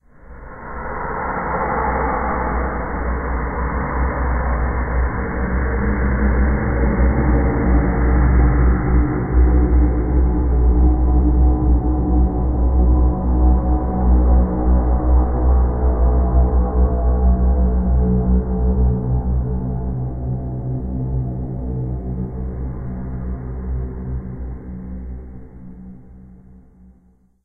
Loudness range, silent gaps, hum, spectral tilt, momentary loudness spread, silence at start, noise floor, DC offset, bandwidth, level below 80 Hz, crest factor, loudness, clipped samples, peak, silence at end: 11 LU; none; none; -14.5 dB/octave; 12 LU; 0.25 s; -54 dBFS; under 0.1%; 2.3 kHz; -18 dBFS; 14 dB; -19 LUFS; under 0.1%; -4 dBFS; 0.9 s